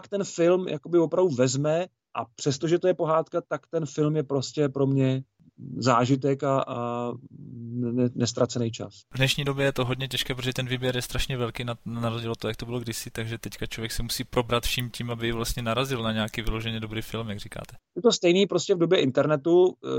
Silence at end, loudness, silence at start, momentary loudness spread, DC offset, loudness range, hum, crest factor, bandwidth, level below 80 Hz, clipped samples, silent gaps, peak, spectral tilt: 0 s; -26 LUFS; 0.05 s; 12 LU; under 0.1%; 5 LU; none; 18 dB; 16.5 kHz; -44 dBFS; under 0.1%; none; -8 dBFS; -5 dB/octave